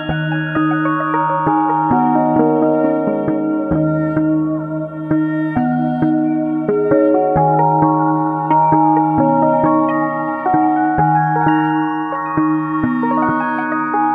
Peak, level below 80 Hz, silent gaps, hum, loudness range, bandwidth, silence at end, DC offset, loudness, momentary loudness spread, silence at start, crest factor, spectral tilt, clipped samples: 0 dBFS; -46 dBFS; none; none; 3 LU; 3.5 kHz; 0 s; under 0.1%; -15 LUFS; 5 LU; 0 s; 14 dB; -10.5 dB/octave; under 0.1%